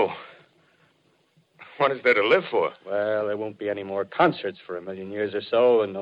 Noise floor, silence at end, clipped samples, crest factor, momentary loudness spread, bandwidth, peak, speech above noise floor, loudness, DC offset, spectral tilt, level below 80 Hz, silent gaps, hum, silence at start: -65 dBFS; 0 s; under 0.1%; 20 dB; 14 LU; 5.4 kHz; -6 dBFS; 41 dB; -24 LUFS; under 0.1%; -7 dB/octave; -72 dBFS; none; none; 0 s